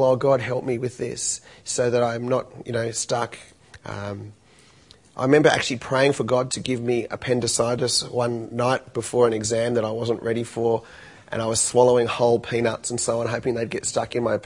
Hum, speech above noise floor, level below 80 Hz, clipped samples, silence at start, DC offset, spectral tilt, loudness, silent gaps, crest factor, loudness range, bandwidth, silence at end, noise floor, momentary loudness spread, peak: none; 31 dB; -58 dBFS; under 0.1%; 0 s; under 0.1%; -4 dB/octave; -23 LUFS; none; 20 dB; 4 LU; 11 kHz; 0 s; -53 dBFS; 11 LU; -2 dBFS